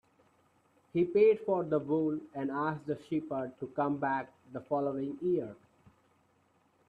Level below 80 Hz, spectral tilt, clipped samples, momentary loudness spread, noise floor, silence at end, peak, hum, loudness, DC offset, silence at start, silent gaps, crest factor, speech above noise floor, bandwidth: -74 dBFS; -9 dB/octave; under 0.1%; 12 LU; -70 dBFS; 1.35 s; -16 dBFS; none; -32 LUFS; under 0.1%; 0.95 s; none; 18 dB; 39 dB; 4.8 kHz